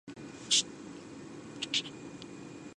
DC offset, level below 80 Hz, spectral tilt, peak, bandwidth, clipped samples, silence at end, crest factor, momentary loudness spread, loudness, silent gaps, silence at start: under 0.1%; -72 dBFS; -1 dB/octave; -14 dBFS; 11.5 kHz; under 0.1%; 0.05 s; 24 dB; 19 LU; -31 LUFS; none; 0.05 s